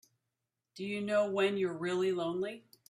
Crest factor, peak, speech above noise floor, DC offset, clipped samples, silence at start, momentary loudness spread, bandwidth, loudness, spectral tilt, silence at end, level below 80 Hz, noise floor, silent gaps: 16 dB; -20 dBFS; 55 dB; under 0.1%; under 0.1%; 0.75 s; 9 LU; 13.5 kHz; -33 LUFS; -5.5 dB/octave; 0.3 s; -78 dBFS; -88 dBFS; none